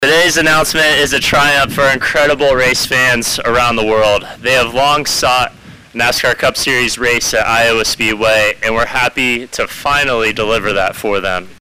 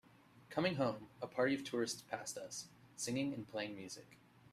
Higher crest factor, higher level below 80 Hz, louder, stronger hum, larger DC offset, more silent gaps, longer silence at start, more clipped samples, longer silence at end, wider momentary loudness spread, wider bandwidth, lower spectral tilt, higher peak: second, 8 dB vs 20 dB; first, -36 dBFS vs -80 dBFS; first, -12 LUFS vs -41 LUFS; neither; neither; neither; second, 0 s vs 0.35 s; neither; second, 0.05 s vs 0.35 s; second, 6 LU vs 12 LU; about the same, 16 kHz vs 15 kHz; second, -2.5 dB/octave vs -4 dB/octave; first, -6 dBFS vs -22 dBFS